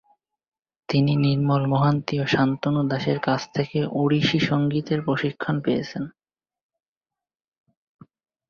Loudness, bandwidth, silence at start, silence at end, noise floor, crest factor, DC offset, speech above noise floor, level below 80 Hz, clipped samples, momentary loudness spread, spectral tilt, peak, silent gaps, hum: -23 LUFS; 7 kHz; 0.9 s; 2.4 s; under -90 dBFS; 18 dB; under 0.1%; over 68 dB; -58 dBFS; under 0.1%; 5 LU; -7 dB/octave; -6 dBFS; none; none